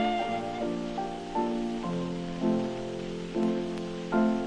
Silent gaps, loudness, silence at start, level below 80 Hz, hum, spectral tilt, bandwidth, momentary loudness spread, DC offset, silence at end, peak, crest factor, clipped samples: none; -31 LUFS; 0 s; -50 dBFS; none; -6.5 dB/octave; 10 kHz; 6 LU; under 0.1%; 0 s; -14 dBFS; 16 dB; under 0.1%